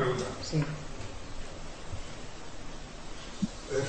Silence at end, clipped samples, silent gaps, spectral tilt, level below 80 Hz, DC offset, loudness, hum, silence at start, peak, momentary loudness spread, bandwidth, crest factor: 0 s; under 0.1%; none; -5 dB/octave; -44 dBFS; 0.5%; -38 LUFS; none; 0 s; -18 dBFS; 13 LU; 8.8 kHz; 18 dB